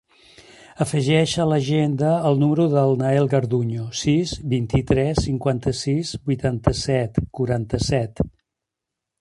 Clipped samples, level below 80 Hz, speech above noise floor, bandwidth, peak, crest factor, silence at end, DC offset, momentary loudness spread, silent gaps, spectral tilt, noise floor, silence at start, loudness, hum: under 0.1%; -40 dBFS; 64 dB; 11.5 kHz; -2 dBFS; 20 dB; 0.9 s; under 0.1%; 6 LU; none; -6.5 dB/octave; -84 dBFS; 0.8 s; -21 LUFS; none